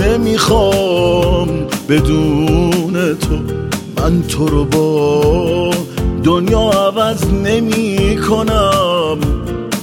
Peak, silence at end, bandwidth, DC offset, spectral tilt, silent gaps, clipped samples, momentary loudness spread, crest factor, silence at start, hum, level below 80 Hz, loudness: 0 dBFS; 0 s; 17.5 kHz; under 0.1%; -6 dB/octave; none; under 0.1%; 6 LU; 12 dB; 0 s; none; -24 dBFS; -14 LUFS